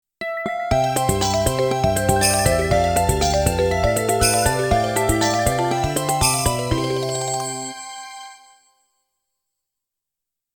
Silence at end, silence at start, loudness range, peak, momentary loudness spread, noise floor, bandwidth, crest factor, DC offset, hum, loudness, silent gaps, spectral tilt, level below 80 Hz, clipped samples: 2.2 s; 0.2 s; 10 LU; -2 dBFS; 10 LU; -84 dBFS; over 20 kHz; 18 dB; under 0.1%; none; -19 LUFS; none; -4 dB/octave; -34 dBFS; under 0.1%